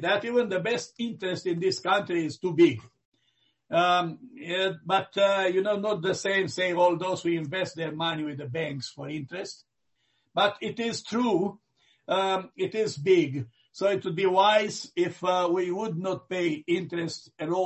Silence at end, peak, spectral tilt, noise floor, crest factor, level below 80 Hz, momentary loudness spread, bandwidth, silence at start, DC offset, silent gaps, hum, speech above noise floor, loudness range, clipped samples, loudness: 0 s; -10 dBFS; -5 dB/octave; -75 dBFS; 18 dB; -70 dBFS; 11 LU; 8.4 kHz; 0 s; under 0.1%; 3.05-3.12 s; none; 48 dB; 5 LU; under 0.1%; -27 LUFS